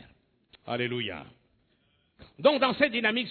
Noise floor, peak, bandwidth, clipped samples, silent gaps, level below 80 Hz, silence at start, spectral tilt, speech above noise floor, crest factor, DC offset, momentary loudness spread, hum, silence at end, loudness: -70 dBFS; -8 dBFS; 4.6 kHz; under 0.1%; none; -66 dBFS; 0.65 s; -7.5 dB/octave; 43 dB; 22 dB; under 0.1%; 12 LU; none; 0 s; -27 LUFS